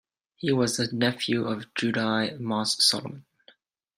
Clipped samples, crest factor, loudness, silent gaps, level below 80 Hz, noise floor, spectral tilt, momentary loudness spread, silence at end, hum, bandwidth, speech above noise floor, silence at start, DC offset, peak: under 0.1%; 20 dB; -25 LUFS; none; -68 dBFS; -60 dBFS; -3.5 dB/octave; 10 LU; 0.75 s; none; 16 kHz; 34 dB; 0.4 s; under 0.1%; -8 dBFS